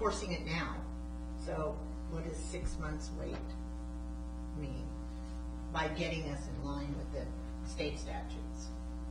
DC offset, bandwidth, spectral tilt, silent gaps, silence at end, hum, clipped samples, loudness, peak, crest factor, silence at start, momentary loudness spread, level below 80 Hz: under 0.1%; 10.5 kHz; -5.5 dB/octave; none; 0 s; 60 Hz at -45 dBFS; under 0.1%; -41 LUFS; -20 dBFS; 20 dB; 0 s; 7 LU; -42 dBFS